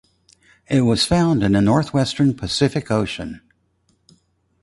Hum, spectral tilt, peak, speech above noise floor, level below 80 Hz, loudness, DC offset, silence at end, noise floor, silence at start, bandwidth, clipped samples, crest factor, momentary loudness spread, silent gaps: none; -6 dB/octave; -4 dBFS; 46 dB; -42 dBFS; -18 LUFS; under 0.1%; 1.25 s; -64 dBFS; 0.7 s; 11.5 kHz; under 0.1%; 16 dB; 10 LU; none